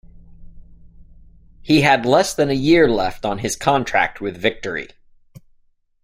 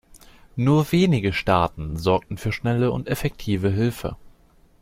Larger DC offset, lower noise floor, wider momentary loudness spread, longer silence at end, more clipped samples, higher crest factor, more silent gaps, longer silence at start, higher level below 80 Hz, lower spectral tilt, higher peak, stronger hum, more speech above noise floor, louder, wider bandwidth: neither; about the same, -58 dBFS vs -55 dBFS; first, 13 LU vs 8 LU; first, 1.15 s vs 0.55 s; neither; about the same, 18 dB vs 18 dB; neither; first, 0.4 s vs 0.15 s; about the same, -44 dBFS vs -42 dBFS; second, -4.5 dB/octave vs -7 dB/octave; about the same, -2 dBFS vs -4 dBFS; neither; first, 41 dB vs 33 dB; first, -18 LUFS vs -22 LUFS; about the same, 16 kHz vs 16.5 kHz